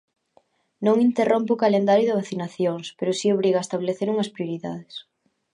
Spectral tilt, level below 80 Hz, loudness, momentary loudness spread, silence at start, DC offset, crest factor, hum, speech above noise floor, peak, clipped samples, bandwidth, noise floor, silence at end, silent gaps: -6 dB/octave; -72 dBFS; -23 LUFS; 12 LU; 0.8 s; under 0.1%; 16 dB; none; 40 dB; -6 dBFS; under 0.1%; 11 kHz; -62 dBFS; 0.5 s; none